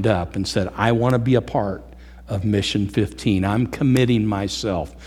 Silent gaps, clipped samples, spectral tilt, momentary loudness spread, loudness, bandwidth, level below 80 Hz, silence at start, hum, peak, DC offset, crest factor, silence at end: none; under 0.1%; -6.5 dB/octave; 7 LU; -21 LUFS; 14 kHz; -42 dBFS; 0 s; none; -2 dBFS; under 0.1%; 18 dB; 0 s